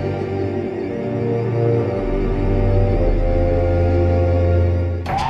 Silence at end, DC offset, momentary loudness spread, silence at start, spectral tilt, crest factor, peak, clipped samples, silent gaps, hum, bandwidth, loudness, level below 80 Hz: 0 s; under 0.1%; 6 LU; 0 s; -9 dB/octave; 12 dB; -6 dBFS; under 0.1%; none; none; 6.4 kHz; -19 LUFS; -24 dBFS